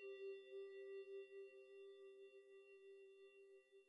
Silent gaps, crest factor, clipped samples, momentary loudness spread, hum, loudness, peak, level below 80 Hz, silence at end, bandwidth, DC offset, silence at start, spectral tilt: none; 12 dB; under 0.1%; 11 LU; none; -59 LUFS; -46 dBFS; under -90 dBFS; 0 s; 10 kHz; under 0.1%; 0 s; -3 dB/octave